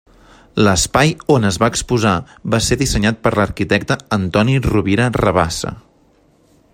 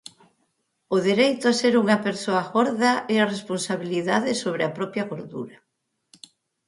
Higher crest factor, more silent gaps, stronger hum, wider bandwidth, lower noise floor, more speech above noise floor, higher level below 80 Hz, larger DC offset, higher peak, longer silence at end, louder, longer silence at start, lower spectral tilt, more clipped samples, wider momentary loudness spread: about the same, 16 dB vs 20 dB; neither; neither; first, 16 kHz vs 11.5 kHz; second, -53 dBFS vs -72 dBFS; second, 38 dB vs 49 dB; first, -34 dBFS vs -70 dBFS; neither; first, 0 dBFS vs -4 dBFS; second, 0.95 s vs 1.2 s; first, -16 LUFS vs -23 LUFS; second, 0.55 s vs 0.9 s; about the same, -5 dB/octave vs -4.5 dB/octave; neither; second, 6 LU vs 11 LU